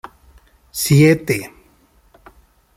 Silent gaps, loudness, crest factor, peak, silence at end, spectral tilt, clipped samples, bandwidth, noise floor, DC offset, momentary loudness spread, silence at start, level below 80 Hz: none; -15 LUFS; 18 dB; -2 dBFS; 1.3 s; -5.5 dB/octave; under 0.1%; 16 kHz; -54 dBFS; under 0.1%; 18 LU; 0.75 s; -50 dBFS